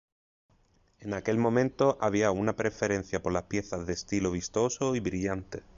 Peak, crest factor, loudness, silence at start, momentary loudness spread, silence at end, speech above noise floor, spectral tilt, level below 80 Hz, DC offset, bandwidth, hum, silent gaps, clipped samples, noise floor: -12 dBFS; 18 dB; -30 LUFS; 1 s; 8 LU; 0.15 s; 37 dB; -5.5 dB/octave; -52 dBFS; under 0.1%; 7.8 kHz; none; none; under 0.1%; -66 dBFS